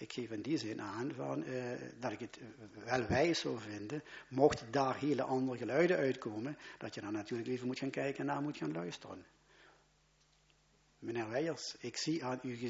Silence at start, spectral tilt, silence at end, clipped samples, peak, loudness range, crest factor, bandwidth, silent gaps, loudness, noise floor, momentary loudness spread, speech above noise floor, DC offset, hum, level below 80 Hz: 0 s; -4.5 dB/octave; 0 s; under 0.1%; -14 dBFS; 9 LU; 24 dB; 7.6 kHz; none; -38 LUFS; -72 dBFS; 14 LU; 34 dB; under 0.1%; none; -66 dBFS